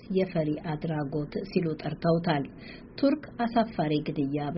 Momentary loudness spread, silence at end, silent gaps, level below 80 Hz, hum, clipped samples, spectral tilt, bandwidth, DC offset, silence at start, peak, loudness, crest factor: 5 LU; 0 s; none; -54 dBFS; none; under 0.1%; -6.5 dB/octave; 5.8 kHz; under 0.1%; 0 s; -12 dBFS; -29 LUFS; 16 dB